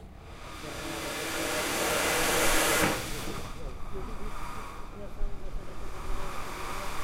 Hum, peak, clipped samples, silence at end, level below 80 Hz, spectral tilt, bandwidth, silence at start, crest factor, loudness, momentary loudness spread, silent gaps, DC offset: none; -12 dBFS; under 0.1%; 0 s; -38 dBFS; -2.5 dB/octave; 16 kHz; 0 s; 20 dB; -30 LUFS; 19 LU; none; under 0.1%